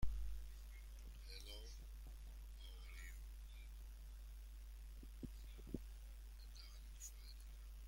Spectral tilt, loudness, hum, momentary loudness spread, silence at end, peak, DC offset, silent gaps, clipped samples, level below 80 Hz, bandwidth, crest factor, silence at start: -4.5 dB/octave; -57 LUFS; none; 5 LU; 0 s; -28 dBFS; under 0.1%; none; under 0.1%; -54 dBFS; 16.5 kHz; 22 dB; 0 s